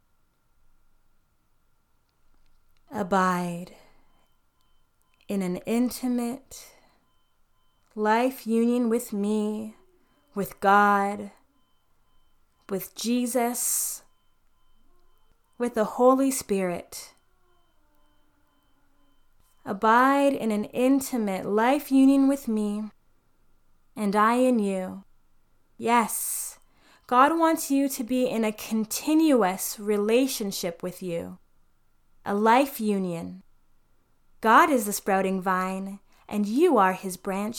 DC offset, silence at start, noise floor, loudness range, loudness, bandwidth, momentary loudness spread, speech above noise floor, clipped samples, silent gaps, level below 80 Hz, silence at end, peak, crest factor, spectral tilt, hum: under 0.1%; 2.9 s; -66 dBFS; 8 LU; -24 LUFS; 19 kHz; 16 LU; 42 dB; under 0.1%; none; -62 dBFS; 0 s; -6 dBFS; 22 dB; -4.5 dB/octave; none